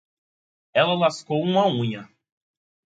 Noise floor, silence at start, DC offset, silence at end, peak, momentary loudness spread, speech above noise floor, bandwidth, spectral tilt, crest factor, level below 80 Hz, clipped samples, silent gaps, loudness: under -90 dBFS; 0.75 s; under 0.1%; 0.9 s; -6 dBFS; 8 LU; over 69 dB; 9.2 kHz; -6 dB/octave; 20 dB; -70 dBFS; under 0.1%; none; -22 LUFS